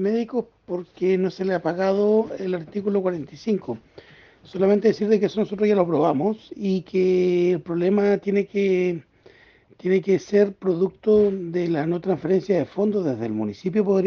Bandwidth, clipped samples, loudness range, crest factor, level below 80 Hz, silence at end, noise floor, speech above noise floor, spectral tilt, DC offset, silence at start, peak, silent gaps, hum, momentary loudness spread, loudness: 6.6 kHz; under 0.1%; 3 LU; 16 dB; -62 dBFS; 0 s; -53 dBFS; 32 dB; -8 dB/octave; under 0.1%; 0 s; -6 dBFS; none; none; 8 LU; -22 LUFS